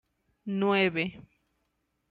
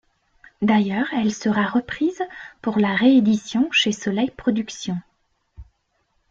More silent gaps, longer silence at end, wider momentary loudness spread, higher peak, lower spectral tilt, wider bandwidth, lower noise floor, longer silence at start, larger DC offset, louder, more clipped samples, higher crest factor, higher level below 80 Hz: neither; first, 0.9 s vs 0.7 s; about the same, 12 LU vs 13 LU; second, -14 dBFS vs -6 dBFS; first, -8 dB/octave vs -5 dB/octave; second, 5 kHz vs 7.6 kHz; first, -77 dBFS vs -69 dBFS; second, 0.45 s vs 0.6 s; neither; second, -28 LUFS vs -21 LUFS; neither; about the same, 18 dB vs 16 dB; second, -68 dBFS vs -54 dBFS